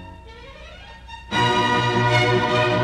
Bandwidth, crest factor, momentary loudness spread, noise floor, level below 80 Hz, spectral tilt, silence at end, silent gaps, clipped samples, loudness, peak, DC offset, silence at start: 11 kHz; 16 dB; 23 LU; -40 dBFS; -44 dBFS; -5 dB/octave; 0 s; none; under 0.1%; -19 LUFS; -6 dBFS; under 0.1%; 0 s